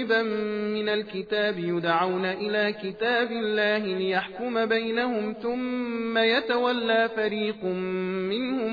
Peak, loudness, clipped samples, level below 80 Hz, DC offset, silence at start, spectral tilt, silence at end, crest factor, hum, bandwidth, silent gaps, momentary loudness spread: -10 dBFS; -26 LUFS; under 0.1%; -66 dBFS; under 0.1%; 0 s; -7 dB/octave; 0 s; 16 dB; none; 5 kHz; none; 6 LU